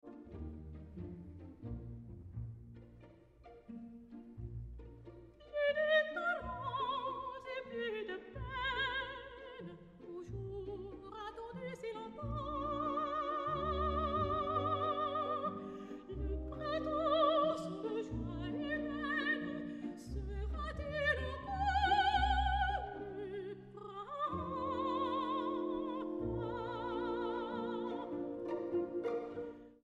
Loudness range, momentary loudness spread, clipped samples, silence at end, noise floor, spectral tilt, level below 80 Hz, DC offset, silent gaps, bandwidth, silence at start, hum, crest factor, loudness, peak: 12 LU; 17 LU; under 0.1%; 0.1 s; -60 dBFS; -6.5 dB/octave; -50 dBFS; under 0.1%; none; 10.5 kHz; 0.05 s; none; 18 dB; -38 LUFS; -20 dBFS